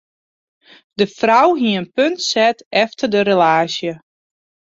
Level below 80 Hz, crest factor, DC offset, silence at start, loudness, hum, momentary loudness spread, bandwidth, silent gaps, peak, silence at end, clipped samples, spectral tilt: -62 dBFS; 16 dB; under 0.1%; 1 s; -16 LUFS; none; 10 LU; 8 kHz; 2.66-2.71 s; -2 dBFS; 0.75 s; under 0.1%; -4 dB/octave